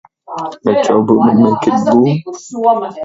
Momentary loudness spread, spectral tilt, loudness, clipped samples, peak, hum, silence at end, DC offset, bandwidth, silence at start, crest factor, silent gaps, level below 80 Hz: 14 LU; -7.5 dB/octave; -12 LUFS; under 0.1%; 0 dBFS; none; 0 s; under 0.1%; 7.8 kHz; 0.3 s; 12 dB; none; -56 dBFS